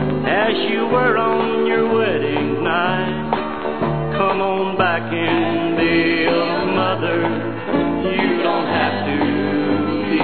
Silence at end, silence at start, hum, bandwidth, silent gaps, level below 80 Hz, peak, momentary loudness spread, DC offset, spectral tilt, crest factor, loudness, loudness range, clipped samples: 0 s; 0 s; none; 4.6 kHz; none; -48 dBFS; -2 dBFS; 5 LU; 1%; -9.5 dB/octave; 16 dB; -18 LUFS; 1 LU; under 0.1%